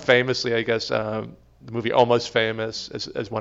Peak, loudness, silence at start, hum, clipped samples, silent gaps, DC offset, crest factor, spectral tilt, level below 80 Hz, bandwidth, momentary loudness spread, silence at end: -4 dBFS; -23 LUFS; 0 s; none; under 0.1%; none; under 0.1%; 20 dB; -4.5 dB/octave; -56 dBFS; 7.8 kHz; 12 LU; 0 s